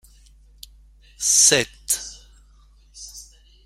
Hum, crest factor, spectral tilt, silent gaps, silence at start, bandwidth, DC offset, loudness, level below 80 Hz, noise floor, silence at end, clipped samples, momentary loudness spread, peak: none; 24 dB; 0 dB/octave; none; 1.2 s; 16.5 kHz; under 0.1%; -17 LUFS; -50 dBFS; -52 dBFS; 0.45 s; under 0.1%; 26 LU; -2 dBFS